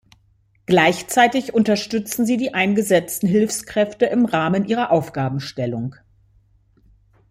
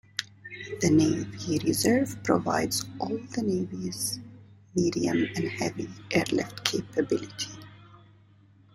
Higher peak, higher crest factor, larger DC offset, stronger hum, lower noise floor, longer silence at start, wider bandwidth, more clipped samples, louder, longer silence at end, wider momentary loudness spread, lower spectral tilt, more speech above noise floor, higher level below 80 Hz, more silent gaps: about the same, -2 dBFS vs -2 dBFS; second, 18 dB vs 28 dB; neither; neither; about the same, -59 dBFS vs -57 dBFS; first, 0.7 s vs 0.2 s; about the same, 16 kHz vs 16 kHz; neither; first, -19 LUFS vs -28 LUFS; first, 1.4 s vs 0.75 s; second, 9 LU vs 12 LU; about the same, -5 dB/octave vs -4.5 dB/octave; first, 41 dB vs 30 dB; about the same, -56 dBFS vs -58 dBFS; neither